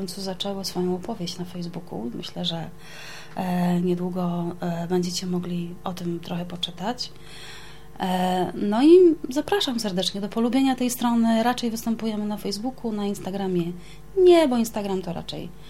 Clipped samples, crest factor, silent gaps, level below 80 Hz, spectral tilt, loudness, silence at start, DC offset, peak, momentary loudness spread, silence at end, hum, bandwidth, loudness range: under 0.1%; 18 dB; none; -52 dBFS; -5.5 dB/octave; -24 LUFS; 0 s; 0.9%; -6 dBFS; 15 LU; 0 s; none; 16.5 kHz; 9 LU